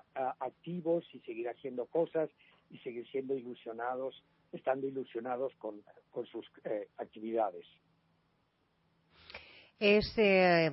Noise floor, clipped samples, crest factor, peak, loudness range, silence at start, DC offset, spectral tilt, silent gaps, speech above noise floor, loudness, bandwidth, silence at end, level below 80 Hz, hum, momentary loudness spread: -76 dBFS; under 0.1%; 22 dB; -14 dBFS; 8 LU; 0.15 s; under 0.1%; -9 dB/octave; none; 41 dB; -35 LUFS; 5.8 kHz; 0 s; -64 dBFS; none; 19 LU